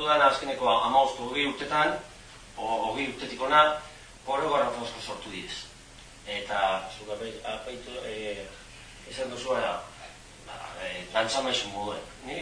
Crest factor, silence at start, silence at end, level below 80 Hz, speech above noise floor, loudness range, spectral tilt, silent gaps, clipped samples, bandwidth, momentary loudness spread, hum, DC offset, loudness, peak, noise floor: 22 dB; 0 s; 0 s; -56 dBFS; 21 dB; 8 LU; -3 dB/octave; none; under 0.1%; 10.5 kHz; 22 LU; none; under 0.1%; -28 LUFS; -8 dBFS; -49 dBFS